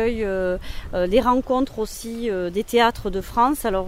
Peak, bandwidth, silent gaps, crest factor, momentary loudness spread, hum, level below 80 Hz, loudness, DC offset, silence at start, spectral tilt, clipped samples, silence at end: -4 dBFS; 16 kHz; none; 18 dB; 10 LU; none; -36 dBFS; -22 LUFS; under 0.1%; 0 s; -5 dB/octave; under 0.1%; 0 s